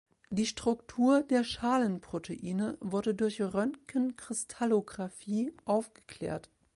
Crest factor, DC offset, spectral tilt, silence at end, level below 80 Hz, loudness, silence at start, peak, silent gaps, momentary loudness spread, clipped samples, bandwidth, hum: 16 dB; under 0.1%; -5 dB/octave; 0.35 s; -64 dBFS; -32 LUFS; 0.3 s; -16 dBFS; none; 11 LU; under 0.1%; 11.5 kHz; none